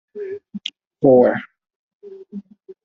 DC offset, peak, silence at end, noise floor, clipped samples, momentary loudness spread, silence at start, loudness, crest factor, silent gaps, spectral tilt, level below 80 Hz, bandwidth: under 0.1%; -2 dBFS; 0.1 s; -37 dBFS; under 0.1%; 24 LU; 0.15 s; -16 LUFS; 20 dB; 0.87-0.91 s, 1.76-2.00 s; -5 dB/octave; -62 dBFS; 7.2 kHz